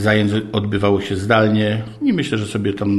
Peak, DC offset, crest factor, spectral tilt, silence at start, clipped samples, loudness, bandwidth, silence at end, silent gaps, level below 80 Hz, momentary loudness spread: 0 dBFS; under 0.1%; 18 dB; -6.5 dB/octave; 0 s; under 0.1%; -18 LUFS; 12 kHz; 0 s; none; -48 dBFS; 6 LU